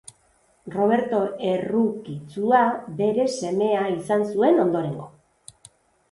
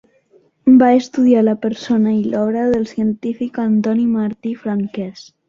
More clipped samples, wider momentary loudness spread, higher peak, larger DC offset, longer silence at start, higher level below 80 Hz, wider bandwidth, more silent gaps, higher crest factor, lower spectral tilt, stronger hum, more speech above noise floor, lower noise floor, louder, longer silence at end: neither; about the same, 10 LU vs 11 LU; second, -6 dBFS vs -2 dBFS; neither; about the same, 0.65 s vs 0.65 s; second, -64 dBFS vs -56 dBFS; first, 11.5 kHz vs 7.2 kHz; neither; about the same, 18 dB vs 14 dB; about the same, -6.5 dB/octave vs -7.5 dB/octave; neither; about the same, 40 dB vs 39 dB; first, -62 dBFS vs -54 dBFS; second, -22 LUFS vs -16 LUFS; first, 1.05 s vs 0.25 s